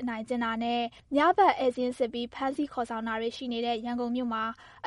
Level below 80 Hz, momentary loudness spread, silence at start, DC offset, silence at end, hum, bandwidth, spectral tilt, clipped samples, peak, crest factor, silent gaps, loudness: -62 dBFS; 9 LU; 0 s; under 0.1%; 0 s; none; 11.5 kHz; -5 dB/octave; under 0.1%; -10 dBFS; 20 dB; none; -29 LUFS